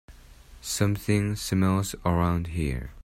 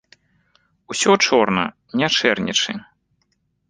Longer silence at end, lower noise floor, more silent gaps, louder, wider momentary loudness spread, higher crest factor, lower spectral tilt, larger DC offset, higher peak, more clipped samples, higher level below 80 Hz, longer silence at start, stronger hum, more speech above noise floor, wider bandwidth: second, 0 s vs 0.85 s; second, -49 dBFS vs -68 dBFS; neither; second, -27 LUFS vs -18 LUFS; second, 7 LU vs 10 LU; about the same, 18 dB vs 20 dB; first, -5.5 dB/octave vs -3 dB/octave; neither; second, -8 dBFS vs -2 dBFS; neither; first, -42 dBFS vs -58 dBFS; second, 0.1 s vs 0.9 s; neither; second, 23 dB vs 50 dB; first, 16 kHz vs 10 kHz